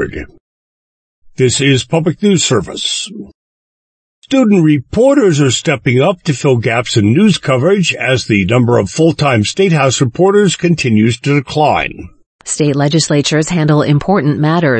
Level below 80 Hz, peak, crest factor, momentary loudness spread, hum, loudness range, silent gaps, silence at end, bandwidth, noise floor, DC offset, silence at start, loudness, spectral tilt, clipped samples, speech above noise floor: -42 dBFS; 0 dBFS; 12 dB; 6 LU; none; 3 LU; 0.40-1.22 s, 3.34-4.22 s, 12.26-12.39 s; 0 s; 8.8 kHz; under -90 dBFS; under 0.1%; 0 s; -12 LUFS; -5 dB/octave; under 0.1%; over 79 dB